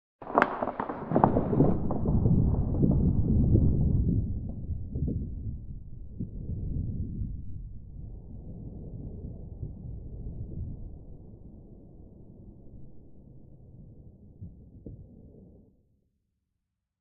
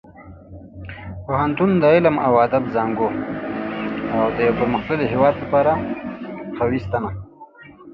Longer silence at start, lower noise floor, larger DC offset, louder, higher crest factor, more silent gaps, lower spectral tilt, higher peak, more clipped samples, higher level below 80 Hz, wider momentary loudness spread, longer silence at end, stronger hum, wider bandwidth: about the same, 0.2 s vs 0.1 s; first, -83 dBFS vs -43 dBFS; neither; second, -29 LUFS vs -19 LUFS; first, 28 dB vs 18 dB; neither; about the same, -9.5 dB/octave vs -9.5 dB/octave; about the same, -2 dBFS vs -2 dBFS; neither; first, -38 dBFS vs -44 dBFS; first, 25 LU vs 16 LU; first, 1.55 s vs 0 s; neither; second, 4.9 kHz vs 5.8 kHz